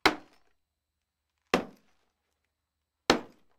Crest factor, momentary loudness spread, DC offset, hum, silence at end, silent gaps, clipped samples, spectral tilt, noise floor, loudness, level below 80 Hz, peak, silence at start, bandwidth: 32 dB; 15 LU; under 0.1%; none; 0.35 s; none; under 0.1%; -3 dB/octave; -85 dBFS; -30 LUFS; -66 dBFS; -4 dBFS; 0.05 s; 16 kHz